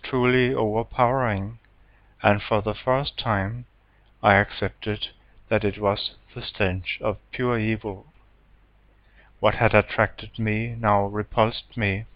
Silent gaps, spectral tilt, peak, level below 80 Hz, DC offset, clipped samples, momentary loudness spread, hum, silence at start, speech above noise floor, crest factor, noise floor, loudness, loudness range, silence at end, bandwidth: none; -9 dB/octave; -2 dBFS; -44 dBFS; under 0.1%; under 0.1%; 10 LU; none; 0.05 s; 34 dB; 24 dB; -57 dBFS; -24 LUFS; 4 LU; 0.1 s; 5.4 kHz